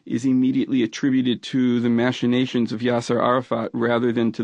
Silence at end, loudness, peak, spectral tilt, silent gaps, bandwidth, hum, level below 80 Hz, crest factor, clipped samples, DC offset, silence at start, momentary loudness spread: 0 s; -21 LUFS; -6 dBFS; -6.5 dB/octave; none; 9 kHz; none; -64 dBFS; 16 dB; under 0.1%; under 0.1%; 0.05 s; 3 LU